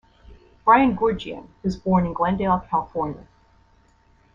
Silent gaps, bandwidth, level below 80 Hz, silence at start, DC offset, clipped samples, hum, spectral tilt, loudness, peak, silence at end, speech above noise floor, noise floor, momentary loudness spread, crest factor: none; 7.2 kHz; -46 dBFS; 0.3 s; under 0.1%; under 0.1%; none; -8 dB/octave; -22 LUFS; -4 dBFS; 1.15 s; 37 dB; -58 dBFS; 14 LU; 20 dB